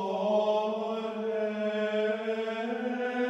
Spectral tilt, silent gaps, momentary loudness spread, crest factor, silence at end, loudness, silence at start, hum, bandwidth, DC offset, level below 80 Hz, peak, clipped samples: -6 dB/octave; none; 6 LU; 14 dB; 0 s; -30 LUFS; 0 s; none; 8.2 kHz; under 0.1%; -80 dBFS; -16 dBFS; under 0.1%